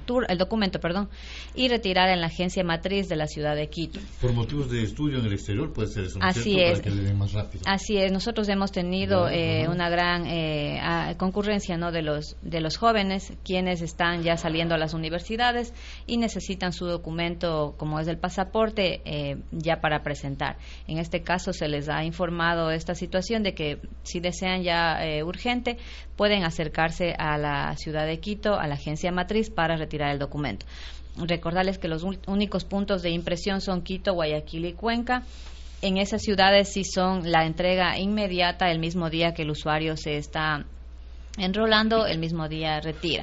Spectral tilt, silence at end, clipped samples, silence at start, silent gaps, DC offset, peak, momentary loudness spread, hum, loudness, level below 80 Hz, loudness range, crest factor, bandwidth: -4 dB/octave; 0 s; under 0.1%; 0 s; none; under 0.1%; -4 dBFS; 9 LU; none; -26 LUFS; -40 dBFS; 4 LU; 22 dB; 8 kHz